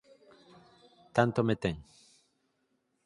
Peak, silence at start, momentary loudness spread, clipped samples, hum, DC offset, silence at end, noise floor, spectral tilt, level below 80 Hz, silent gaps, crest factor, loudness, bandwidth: -10 dBFS; 1.15 s; 9 LU; under 0.1%; none; under 0.1%; 1.25 s; -77 dBFS; -7 dB/octave; -60 dBFS; none; 26 dB; -30 LUFS; 11.5 kHz